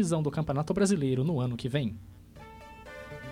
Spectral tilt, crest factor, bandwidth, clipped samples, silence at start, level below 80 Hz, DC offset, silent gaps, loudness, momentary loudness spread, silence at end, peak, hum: -6.5 dB/octave; 16 dB; 15.5 kHz; under 0.1%; 0 s; -54 dBFS; under 0.1%; none; -29 LUFS; 22 LU; 0 s; -14 dBFS; none